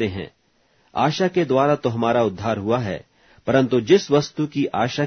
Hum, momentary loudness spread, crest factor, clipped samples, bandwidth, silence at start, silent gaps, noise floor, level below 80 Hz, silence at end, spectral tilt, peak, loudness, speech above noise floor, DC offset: none; 14 LU; 18 dB; under 0.1%; 6.6 kHz; 0 s; none; -61 dBFS; -56 dBFS; 0 s; -6 dB/octave; -2 dBFS; -20 LUFS; 41 dB; under 0.1%